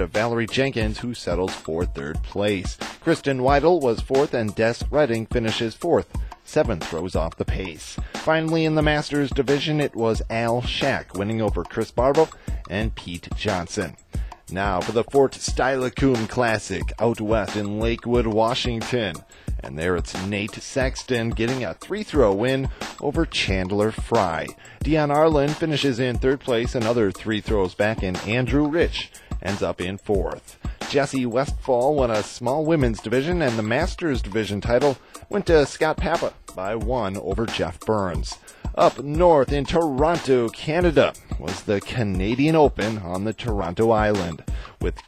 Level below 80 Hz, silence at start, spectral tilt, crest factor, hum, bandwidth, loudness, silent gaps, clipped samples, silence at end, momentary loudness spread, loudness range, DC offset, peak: -34 dBFS; 0 s; -5.5 dB/octave; 18 dB; none; 15.5 kHz; -23 LUFS; none; under 0.1%; 0.05 s; 10 LU; 4 LU; under 0.1%; -4 dBFS